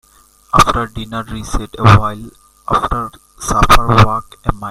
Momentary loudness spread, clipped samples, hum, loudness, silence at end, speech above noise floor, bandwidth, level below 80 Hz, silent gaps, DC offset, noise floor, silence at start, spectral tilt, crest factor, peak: 14 LU; 0.2%; none; -14 LUFS; 0 s; 35 dB; 16 kHz; -24 dBFS; none; under 0.1%; -48 dBFS; 0.55 s; -5 dB/octave; 14 dB; 0 dBFS